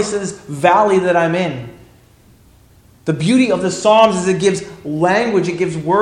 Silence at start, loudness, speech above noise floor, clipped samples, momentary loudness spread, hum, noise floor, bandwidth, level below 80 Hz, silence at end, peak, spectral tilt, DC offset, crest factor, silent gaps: 0 s; -15 LUFS; 33 dB; under 0.1%; 13 LU; none; -48 dBFS; 12 kHz; -52 dBFS; 0 s; 0 dBFS; -5 dB/octave; under 0.1%; 16 dB; none